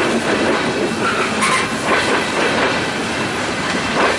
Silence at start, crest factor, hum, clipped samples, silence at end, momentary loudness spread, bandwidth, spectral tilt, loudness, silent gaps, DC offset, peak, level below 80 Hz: 0 s; 14 dB; none; under 0.1%; 0 s; 4 LU; 11.5 kHz; -3.5 dB/octave; -17 LUFS; none; under 0.1%; -2 dBFS; -46 dBFS